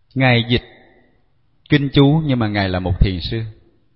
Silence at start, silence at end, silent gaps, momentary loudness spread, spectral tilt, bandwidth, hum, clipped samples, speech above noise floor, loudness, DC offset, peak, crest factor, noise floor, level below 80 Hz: 0.15 s; 0.45 s; none; 11 LU; -10 dB/octave; 5.8 kHz; none; under 0.1%; 45 dB; -17 LUFS; under 0.1%; 0 dBFS; 18 dB; -61 dBFS; -28 dBFS